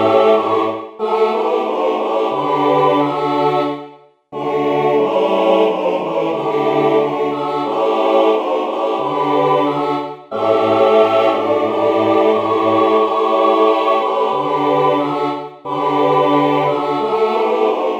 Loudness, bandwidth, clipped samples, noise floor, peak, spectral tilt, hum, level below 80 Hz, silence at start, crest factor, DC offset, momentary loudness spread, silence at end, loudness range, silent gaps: -15 LUFS; 8.4 kHz; under 0.1%; -40 dBFS; 0 dBFS; -6.5 dB/octave; none; -64 dBFS; 0 s; 14 dB; under 0.1%; 6 LU; 0 s; 3 LU; none